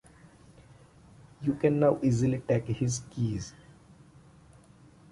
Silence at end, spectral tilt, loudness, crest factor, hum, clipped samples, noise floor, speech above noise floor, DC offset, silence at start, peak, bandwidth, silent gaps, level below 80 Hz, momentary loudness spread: 1.6 s; -7 dB/octave; -29 LUFS; 20 dB; none; under 0.1%; -56 dBFS; 29 dB; under 0.1%; 1.4 s; -12 dBFS; 11.5 kHz; none; -56 dBFS; 9 LU